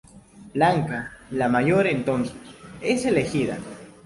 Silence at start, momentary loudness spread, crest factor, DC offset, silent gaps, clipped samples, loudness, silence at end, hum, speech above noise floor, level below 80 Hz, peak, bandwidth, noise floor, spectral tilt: 0.15 s; 14 LU; 18 dB; under 0.1%; none; under 0.1%; -23 LUFS; 0.15 s; none; 24 dB; -54 dBFS; -6 dBFS; 11.5 kHz; -47 dBFS; -6 dB/octave